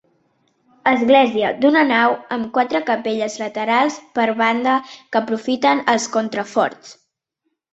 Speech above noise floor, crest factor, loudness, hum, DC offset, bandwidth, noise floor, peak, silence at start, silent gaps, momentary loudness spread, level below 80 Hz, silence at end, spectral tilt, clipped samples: 56 dB; 18 dB; -18 LUFS; none; under 0.1%; 8.2 kHz; -74 dBFS; -2 dBFS; 0.85 s; none; 9 LU; -64 dBFS; 0.8 s; -3.5 dB/octave; under 0.1%